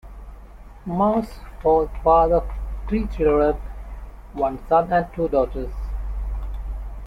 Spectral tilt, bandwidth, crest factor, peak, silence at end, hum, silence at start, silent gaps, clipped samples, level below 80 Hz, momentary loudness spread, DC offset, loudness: -9 dB/octave; 9.8 kHz; 18 dB; -4 dBFS; 0 s; none; 0.05 s; none; under 0.1%; -30 dBFS; 19 LU; under 0.1%; -22 LUFS